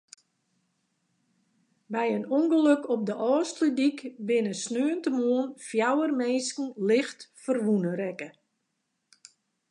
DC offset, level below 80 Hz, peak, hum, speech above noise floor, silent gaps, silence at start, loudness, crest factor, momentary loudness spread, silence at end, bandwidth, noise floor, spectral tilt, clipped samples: under 0.1%; -84 dBFS; -10 dBFS; none; 53 dB; none; 1.9 s; -27 LUFS; 18 dB; 10 LU; 1.4 s; 11 kHz; -79 dBFS; -5 dB/octave; under 0.1%